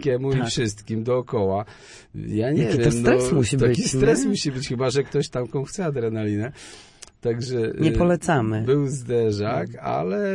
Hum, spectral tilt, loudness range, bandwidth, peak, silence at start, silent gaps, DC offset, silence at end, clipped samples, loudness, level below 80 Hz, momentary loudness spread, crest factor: none; -6 dB/octave; 5 LU; 11.5 kHz; -2 dBFS; 0 s; none; under 0.1%; 0 s; under 0.1%; -23 LUFS; -42 dBFS; 9 LU; 20 dB